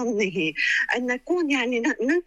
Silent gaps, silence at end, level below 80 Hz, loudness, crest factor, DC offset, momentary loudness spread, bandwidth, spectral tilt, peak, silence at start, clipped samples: none; 0.05 s; -60 dBFS; -23 LUFS; 12 dB; under 0.1%; 3 LU; 11 kHz; -4 dB/octave; -12 dBFS; 0 s; under 0.1%